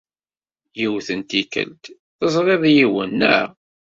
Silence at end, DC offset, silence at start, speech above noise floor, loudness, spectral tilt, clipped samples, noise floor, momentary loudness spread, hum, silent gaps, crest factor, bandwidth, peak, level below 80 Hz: 0.45 s; under 0.1%; 0.75 s; over 72 dB; -18 LUFS; -5 dB/octave; under 0.1%; under -90 dBFS; 12 LU; none; 1.99-2.19 s; 18 dB; 7.8 kHz; -2 dBFS; -60 dBFS